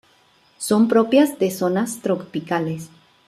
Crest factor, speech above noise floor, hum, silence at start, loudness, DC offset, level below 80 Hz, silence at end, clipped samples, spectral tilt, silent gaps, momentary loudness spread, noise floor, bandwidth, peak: 18 dB; 38 dB; none; 0.6 s; -20 LUFS; under 0.1%; -66 dBFS; 0.4 s; under 0.1%; -5.5 dB/octave; none; 11 LU; -57 dBFS; 14.5 kHz; -4 dBFS